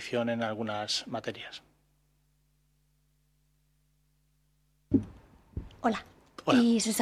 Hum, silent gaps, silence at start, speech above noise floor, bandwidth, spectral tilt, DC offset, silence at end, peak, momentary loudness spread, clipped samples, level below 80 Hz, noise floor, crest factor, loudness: 50 Hz at -65 dBFS; none; 0 s; 42 dB; 15 kHz; -4 dB/octave; under 0.1%; 0 s; -12 dBFS; 20 LU; under 0.1%; -58 dBFS; -71 dBFS; 22 dB; -30 LUFS